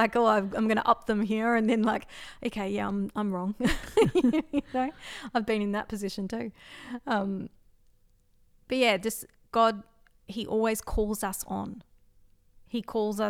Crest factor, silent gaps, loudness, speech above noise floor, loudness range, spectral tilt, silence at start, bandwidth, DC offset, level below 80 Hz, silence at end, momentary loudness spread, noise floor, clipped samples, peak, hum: 20 dB; none; -28 LUFS; 35 dB; 5 LU; -5 dB/octave; 0 s; 16.5 kHz; under 0.1%; -48 dBFS; 0 s; 14 LU; -63 dBFS; under 0.1%; -8 dBFS; none